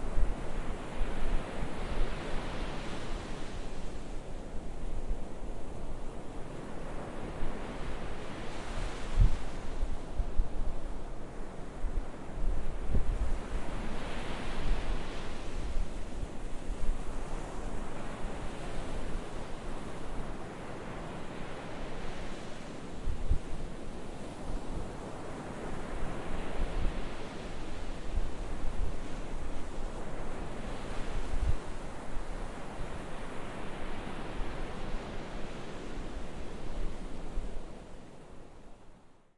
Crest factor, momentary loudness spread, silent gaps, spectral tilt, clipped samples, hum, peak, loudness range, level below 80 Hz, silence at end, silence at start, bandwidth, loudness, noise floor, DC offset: 20 dB; 7 LU; none; -6 dB/octave; under 0.1%; none; -12 dBFS; 5 LU; -36 dBFS; 0.25 s; 0 s; 11 kHz; -41 LUFS; -53 dBFS; under 0.1%